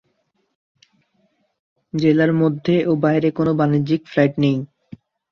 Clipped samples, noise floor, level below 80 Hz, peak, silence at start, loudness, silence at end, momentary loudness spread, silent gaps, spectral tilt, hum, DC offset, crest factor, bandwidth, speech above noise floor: under 0.1%; -68 dBFS; -58 dBFS; -4 dBFS; 1.95 s; -18 LUFS; 0.65 s; 5 LU; none; -9 dB/octave; none; under 0.1%; 16 dB; 6.6 kHz; 51 dB